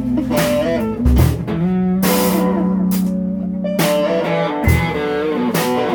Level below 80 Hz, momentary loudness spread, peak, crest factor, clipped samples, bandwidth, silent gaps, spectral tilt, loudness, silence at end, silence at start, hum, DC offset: -26 dBFS; 5 LU; -2 dBFS; 14 dB; under 0.1%; over 20 kHz; none; -6 dB/octave; -17 LUFS; 0 s; 0 s; none; under 0.1%